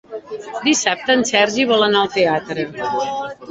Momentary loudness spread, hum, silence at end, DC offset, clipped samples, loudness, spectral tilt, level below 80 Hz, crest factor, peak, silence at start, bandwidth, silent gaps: 12 LU; none; 0 s; under 0.1%; under 0.1%; -17 LUFS; -2.5 dB/octave; -58 dBFS; 16 dB; -2 dBFS; 0.1 s; 8.2 kHz; none